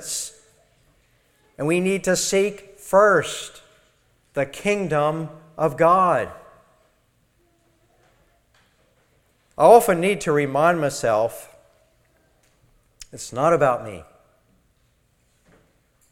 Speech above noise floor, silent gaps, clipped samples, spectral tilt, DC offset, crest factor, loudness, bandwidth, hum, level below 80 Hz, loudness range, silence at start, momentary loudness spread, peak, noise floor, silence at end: 45 dB; none; under 0.1%; -4.5 dB/octave; under 0.1%; 22 dB; -20 LUFS; 16.5 kHz; none; -56 dBFS; 7 LU; 0 s; 20 LU; 0 dBFS; -64 dBFS; 2.1 s